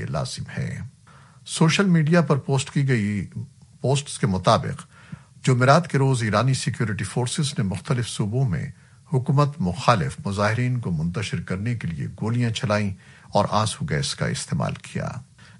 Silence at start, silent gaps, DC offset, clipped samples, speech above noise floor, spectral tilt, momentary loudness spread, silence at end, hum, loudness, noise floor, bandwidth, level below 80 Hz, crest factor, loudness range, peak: 0 s; none; under 0.1%; under 0.1%; 27 dB; -5.5 dB/octave; 13 LU; 0.35 s; none; -23 LUFS; -50 dBFS; 11.5 kHz; -52 dBFS; 22 dB; 3 LU; -2 dBFS